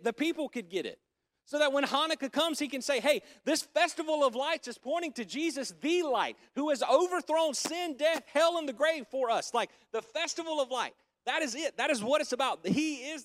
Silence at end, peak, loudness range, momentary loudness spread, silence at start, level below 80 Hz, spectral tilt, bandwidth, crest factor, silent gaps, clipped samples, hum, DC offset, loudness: 0 s; -12 dBFS; 3 LU; 8 LU; 0 s; -80 dBFS; -3 dB/octave; 16 kHz; 18 dB; none; under 0.1%; none; under 0.1%; -31 LUFS